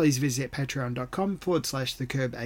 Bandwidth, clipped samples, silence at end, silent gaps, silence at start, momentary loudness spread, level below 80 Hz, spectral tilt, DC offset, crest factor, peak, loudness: 17 kHz; under 0.1%; 0 s; none; 0 s; 4 LU; -54 dBFS; -5 dB/octave; under 0.1%; 14 dB; -14 dBFS; -29 LUFS